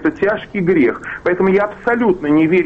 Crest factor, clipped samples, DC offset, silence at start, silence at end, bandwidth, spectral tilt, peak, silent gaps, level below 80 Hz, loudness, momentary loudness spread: 10 dB; under 0.1%; under 0.1%; 0 s; 0 s; 7.6 kHz; -8.5 dB/octave; -4 dBFS; none; -46 dBFS; -16 LUFS; 5 LU